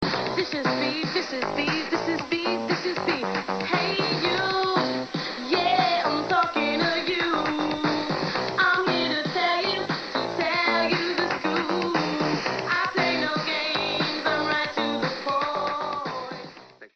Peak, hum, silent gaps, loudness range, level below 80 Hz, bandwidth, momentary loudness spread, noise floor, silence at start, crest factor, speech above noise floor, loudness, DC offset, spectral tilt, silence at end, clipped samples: -8 dBFS; none; none; 2 LU; -64 dBFS; 8 kHz; 6 LU; -46 dBFS; 0 s; 18 dB; 20 dB; -25 LUFS; under 0.1%; -4.5 dB/octave; 0.1 s; under 0.1%